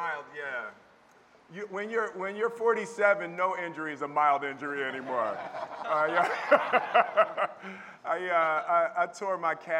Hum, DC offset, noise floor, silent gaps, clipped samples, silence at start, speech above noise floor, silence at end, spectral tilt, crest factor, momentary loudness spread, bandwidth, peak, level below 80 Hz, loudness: none; under 0.1%; -59 dBFS; none; under 0.1%; 0 s; 30 dB; 0 s; -4.5 dB/octave; 22 dB; 13 LU; 11 kHz; -6 dBFS; -82 dBFS; -29 LUFS